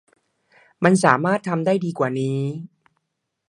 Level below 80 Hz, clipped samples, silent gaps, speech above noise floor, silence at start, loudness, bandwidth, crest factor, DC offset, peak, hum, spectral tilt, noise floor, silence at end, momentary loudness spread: -68 dBFS; under 0.1%; none; 58 dB; 0.8 s; -20 LUFS; 11.5 kHz; 22 dB; under 0.1%; 0 dBFS; none; -6.5 dB/octave; -78 dBFS; 0.8 s; 10 LU